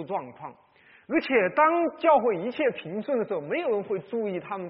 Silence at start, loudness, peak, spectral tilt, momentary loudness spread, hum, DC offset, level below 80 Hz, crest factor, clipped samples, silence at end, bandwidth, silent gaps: 0 s; -26 LUFS; -8 dBFS; -4 dB/octave; 12 LU; none; under 0.1%; -70 dBFS; 18 dB; under 0.1%; 0 s; 5.2 kHz; none